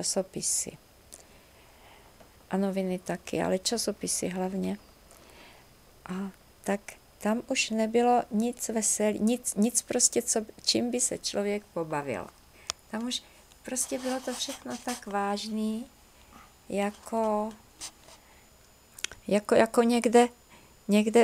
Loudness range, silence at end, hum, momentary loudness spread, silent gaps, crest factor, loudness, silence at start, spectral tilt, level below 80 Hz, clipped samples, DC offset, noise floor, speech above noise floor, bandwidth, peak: 8 LU; 0 s; none; 14 LU; none; 22 dB; -29 LUFS; 0 s; -3.5 dB/octave; -62 dBFS; under 0.1%; under 0.1%; -58 dBFS; 30 dB; 16.5 kHz; -8 dBFS